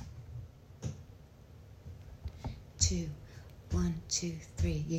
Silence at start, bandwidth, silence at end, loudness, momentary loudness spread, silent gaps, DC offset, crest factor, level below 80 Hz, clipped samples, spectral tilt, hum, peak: 0 s; 15 kHz; 0 s; -37 LUFS; 23 LU; none; under 0.1%; 24 dB; -48 dBFS; under 0.1%; -4 dB/octave; none; -14 dBFS